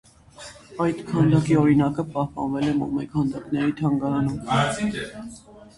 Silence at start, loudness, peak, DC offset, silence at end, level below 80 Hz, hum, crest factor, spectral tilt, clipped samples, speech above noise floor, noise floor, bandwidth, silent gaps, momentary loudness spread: 0.4 s; -23 LUFS; -6 dBFS; under 0.1%; 0.1 s; -50 dBFS; none; 16 dB; -7 dB/octave; under 0.1%; 22 dB; -44 dBFS; 11.5 kHz; none; 20 LU